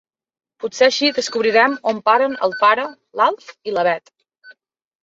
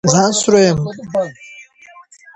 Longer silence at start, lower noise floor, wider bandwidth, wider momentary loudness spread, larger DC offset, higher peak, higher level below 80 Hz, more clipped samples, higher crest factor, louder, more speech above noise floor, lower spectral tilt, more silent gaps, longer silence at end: first, 0.65 s vs 0.05 s; first, -49 dBFS vs -43 dBFS; second, 7.8 kHz vs 9 kHz; about the same, 12 LU vs 13 LU; neither; about the same, -2 dBFS vs 0 dBFS; second, -68 dBFS vs -48 dBFS; neither; about the same, 18 dB vs 16 dB; about the same, -17 LUFS vs -15 LUFS; about the same, 32 dB vs 29 dB; second, -2.5 dB/octave vs -4.5 dB/octave; neither; second, 0.5 s vs 0.75 s